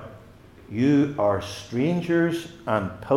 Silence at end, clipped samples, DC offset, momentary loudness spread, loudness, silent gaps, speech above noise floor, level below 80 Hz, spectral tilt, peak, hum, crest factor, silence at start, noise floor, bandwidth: 0 s; under 0.1%; under 0.1%; 11 LU; -24 LUFS; none; 25 dB; -56 dBFS; -7 dB/octave; -8 dBFS; none; 18 dB; 0 s; -48 dBFS; 13 kHz